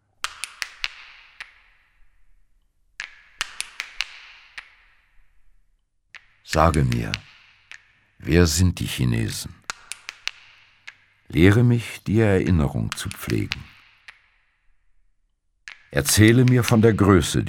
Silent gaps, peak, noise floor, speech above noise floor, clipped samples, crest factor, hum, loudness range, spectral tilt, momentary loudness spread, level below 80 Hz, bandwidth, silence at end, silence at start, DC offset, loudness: none; 0 dBFS; -67 dBFS; 49 dB; under 0.1%; 24 dB; none; 13 LU; -5.5 dB/octave; 24 LU; -40 dBFS; 17.5 kHz; 0 s; 0.25 s; under 0.1%; -21 LUFS